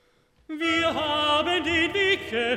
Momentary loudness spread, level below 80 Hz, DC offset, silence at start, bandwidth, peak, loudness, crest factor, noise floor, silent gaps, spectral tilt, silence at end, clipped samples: 4 LU; -54 dBFS; under 0.1%; 0.5 s; 14.5 kHz; -10 dBFS; -23 LUFS; 14 dB; -54 dBFS; none; -3.5 dB/octave; 0 s; under 0.1%